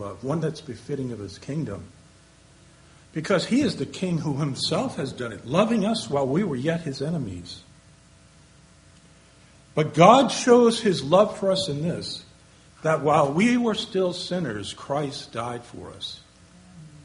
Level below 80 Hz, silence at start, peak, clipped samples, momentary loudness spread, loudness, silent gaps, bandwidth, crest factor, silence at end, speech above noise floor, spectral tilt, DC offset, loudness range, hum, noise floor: -58 dBFS; 0 s; 0 dBFS; under 0.1%; 18 LU; -23 LUFS; none; 10.5 kHz; 24 dB; 0.05 s; 30 dB; -5.5 dB/octave; under 0.1%; 11 LU; none; -53 dBFS